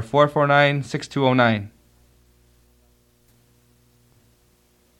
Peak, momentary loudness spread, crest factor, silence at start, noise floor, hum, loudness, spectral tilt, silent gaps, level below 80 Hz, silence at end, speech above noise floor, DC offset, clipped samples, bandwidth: -2 dBFS; 11 LU; 22 dB; 0 s; -60 dBFS; 60 Hz at -55 dBFS; -19 LUFS; -6.5 dB/octave; none; -60 dBFS; 3.3 s; 42 dB; under 0.1%; under 0.1%; 12 kHz